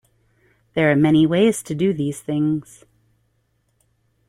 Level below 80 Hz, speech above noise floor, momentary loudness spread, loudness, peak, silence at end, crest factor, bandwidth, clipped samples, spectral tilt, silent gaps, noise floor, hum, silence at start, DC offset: -56 dBFS; 48 dB; 10 LU; -19 LUFS; -4 dBFS; 1.65 s; 18 dB; 15 kHz; under 0.1%; -6.5 dB/octave; none; -67 dBFS; none; 0.75 s; under 0.1%